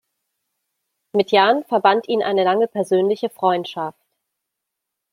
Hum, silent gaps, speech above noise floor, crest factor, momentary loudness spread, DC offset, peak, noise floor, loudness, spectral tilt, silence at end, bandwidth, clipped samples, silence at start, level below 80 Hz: none; none; 63 dB; 20 dB; 9 LU; under 0.1%; -2 dBFS; -81 dBFS; -18 LUFS; -5.5 dB/octave; 1.2 s; 15 kHz; under 0.1%; 1.15 s; -74 dBFS